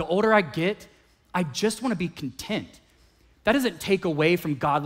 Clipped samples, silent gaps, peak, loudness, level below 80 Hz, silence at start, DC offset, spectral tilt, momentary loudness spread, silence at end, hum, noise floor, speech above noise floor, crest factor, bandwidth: under 0.1%; none; -6 dBFS; -25 LUFS; -56 dBFS; 0 s; under 0.1%; -5 dB/octave; 11 LU; 0 s; none; -59 dBFS; 34 dB; 20 dB; 16 kHz